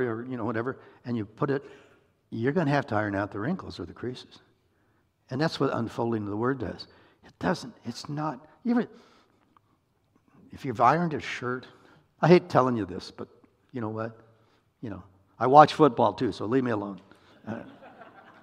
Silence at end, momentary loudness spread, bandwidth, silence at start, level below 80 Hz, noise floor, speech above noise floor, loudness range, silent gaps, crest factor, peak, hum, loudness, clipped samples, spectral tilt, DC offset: 0.4 s; 20 LU; 11.5 kHz; 0 s; -66 dBFS; -69 dBFS; 42 dB; 8 LU; none; 26 dB; -2 dBFS; none; -27 LUFS; under 0.1%; -7 dB/octave; under 0.1%